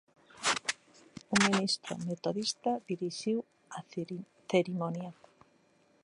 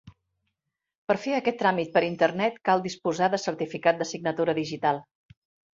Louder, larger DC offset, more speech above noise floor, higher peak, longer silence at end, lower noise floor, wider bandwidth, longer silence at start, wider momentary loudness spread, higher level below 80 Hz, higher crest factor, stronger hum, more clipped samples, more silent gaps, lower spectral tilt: second, -33 LUFS vs -26 LUFS; neither; second, 35 dB vs 58 dB; second, -10 dBFS vs -6 dBFS; first, 0.9 s vs 0.75 s; second, -68 dBFS vs -84 dBFS; first, 11.5 kHz vs 7.8 kHz; first, 0.35 s vs 0.05 s; first, 17 LU vs 5 LU; second, -74 dBFS vs -68 dBFS; about the same, 24 dB vs 20 dB; neither; neither; second, none vs 0.95-1.07 s; second, -3.5 dB/octave vs -5 dB/octave